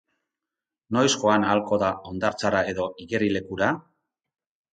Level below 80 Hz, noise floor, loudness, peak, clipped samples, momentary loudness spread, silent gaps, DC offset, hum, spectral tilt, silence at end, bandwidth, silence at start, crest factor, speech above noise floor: -56 dBFS; -89 dBFS; -24 LUFS; -6 dBFS; under 0.1%; 8 LU; none; under 0.1%; none; -4.5 dB/octave; 0.95 s; 9.4 kHz; 0.9 s; 20 dB; 65 dB